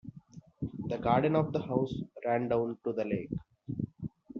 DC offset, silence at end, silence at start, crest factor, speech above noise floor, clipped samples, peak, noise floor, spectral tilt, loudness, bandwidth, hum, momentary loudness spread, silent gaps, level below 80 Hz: under 0.1%; 0 s; 0.05 s; 20 dB; 23 dB; under 0.1%; -12 dBFS; -53 dBFS; -7 dB/octave; -33 LUFS; 6.8 kHz; none; 14 LU; none; -60 dBFS